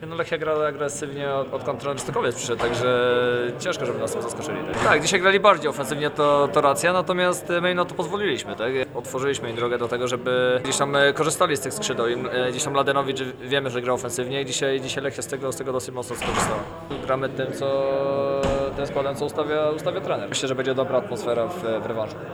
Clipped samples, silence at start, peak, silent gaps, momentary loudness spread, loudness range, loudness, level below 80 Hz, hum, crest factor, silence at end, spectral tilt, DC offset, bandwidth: under 0.1%; 0 s; -2 dBFS; none; 9 LU; 6 LU; -23 LUFS; -50 dBFS; none; 22 dB; 0 s; -4 dB/octave; under 0.1%; over 20 kHz